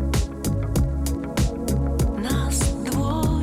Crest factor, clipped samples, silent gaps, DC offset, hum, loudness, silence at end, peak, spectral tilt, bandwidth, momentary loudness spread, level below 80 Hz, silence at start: 10 dB; under 0.1%; none; under 0.1%; none; -24 LUFS; 0 s; -12 dBFS; -5.5 dB/octave; 16 kHz; 3 LU; -26 dBFS; 0 s